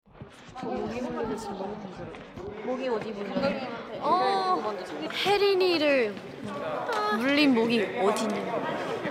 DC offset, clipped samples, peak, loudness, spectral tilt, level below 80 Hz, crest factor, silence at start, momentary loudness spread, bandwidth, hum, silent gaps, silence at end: under 0.1%; under 0.1%; -10 dBFS; -27 LUFS; -4.5 dB/octave; -62 dBFS; 18 dB; 0.15 s; 16 LU; 16 kHz; none; none; 0 s